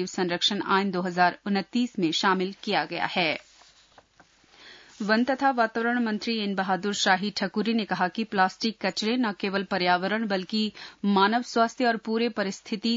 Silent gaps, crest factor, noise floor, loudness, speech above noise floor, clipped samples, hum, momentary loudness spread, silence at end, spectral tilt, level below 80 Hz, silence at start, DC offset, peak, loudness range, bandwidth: none; 18 dB; -60 dBFS; -26 LUFS; 34 dB; under 0.1%; none; 5 LU; 0 s; -4.5 dB/octave; -72 dBFS; 0 s; under 0.1%; -8 dBFS; 3 LU; 7.8 kHz